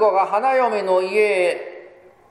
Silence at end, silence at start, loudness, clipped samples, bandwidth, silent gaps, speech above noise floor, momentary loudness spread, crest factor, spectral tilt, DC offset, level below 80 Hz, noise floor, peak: 0.45 s; 0 s; -18 LUFS; under 0.1%; 12 kHz; none; 28 dB; 8 LU; 14 dB; -4 dB/octave; under 0.1%; -70 dBFS; -46 dBFS; -6 dBFS